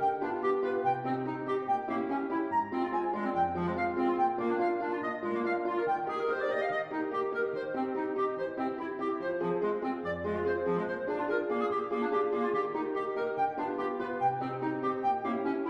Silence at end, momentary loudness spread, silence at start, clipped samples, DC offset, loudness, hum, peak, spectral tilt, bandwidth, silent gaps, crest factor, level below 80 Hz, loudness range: 0 s; 4 LU; 0 s; under 0.1%; under 0.1%; -32 LUFS; none; -18 dBFS; -8 dB/octave; 6.6 kHz; none; 14 dB; -66 dBFS; 2 LU